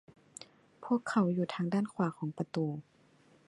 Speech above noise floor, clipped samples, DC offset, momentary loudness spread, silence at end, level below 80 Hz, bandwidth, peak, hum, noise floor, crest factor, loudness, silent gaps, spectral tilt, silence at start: 32 dB; under 0.1%; under 0.1%; 21 LU; 0.65 s; -78 dBFS; 11.5 kHz; -16 dBFS; none; -65 dBFS; 18 dB; -34 LUFS; none; -7 dB/octave; 0.4 s